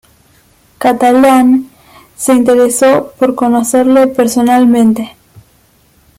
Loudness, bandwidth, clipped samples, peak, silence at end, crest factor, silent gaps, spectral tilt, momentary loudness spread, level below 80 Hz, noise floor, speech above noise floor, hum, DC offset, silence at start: -9 LUFS; 16 kHz; under 0.1%; 0 dBFS; 1.1 s; 10 dB; none; -4.5 dB/octave; 7 LU; -50 dBFS; -49 dBFS; 41 dB; none; under 0.1%; 0.8 s